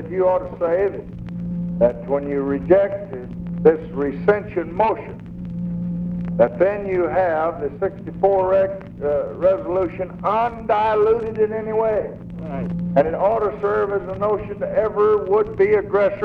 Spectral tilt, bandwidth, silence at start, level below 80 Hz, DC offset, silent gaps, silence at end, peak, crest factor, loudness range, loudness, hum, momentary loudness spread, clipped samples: -9.5 dB/octave; 5 kHz; 0 s; -44 dBFS; under 0.1%; none; 0 s; 0 dBFS; 20 dB; 2 LU; -20 LUFS; none; 11 LU; under 0.1%